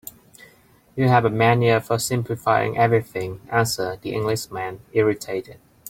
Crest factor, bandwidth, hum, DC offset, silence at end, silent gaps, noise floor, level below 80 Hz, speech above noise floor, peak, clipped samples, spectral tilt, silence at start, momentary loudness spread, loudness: 20 dB; 16.5 kHz; none; under 0.1%; 0.35 s; none; -54 dBFS; -54 dBFS; 33 dB; -2 dBFS; under 0.1%; -5.5 dB/octave; 0.95 s; 12 LU; -21 LUFS